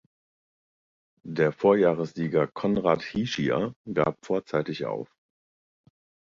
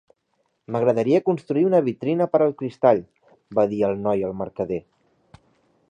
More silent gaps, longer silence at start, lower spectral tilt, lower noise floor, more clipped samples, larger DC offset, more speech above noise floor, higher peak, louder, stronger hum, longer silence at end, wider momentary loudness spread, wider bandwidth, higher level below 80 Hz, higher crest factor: first, 3.76-3.85 s vs none; first, 1.25 s vs 0.7 s; second, -7 dB/octave vs -9 dB/octave; first, under -90 dBFS vs -71 dBFS; neither; neither; first, over 65 dB vs 50 dB; second, -8 dBFS vs -4 dBFS; second, -26 LUFS vs -22 LUFS; neither; first, 1.25 s vs 1.1 s; about the same, 11 LU vs 9 LU; second, 7.4 kHz vs 9.2 kHz; about the same, -60 dBFS vs -60 dBFS; about the same, 20 dB vs 20 dB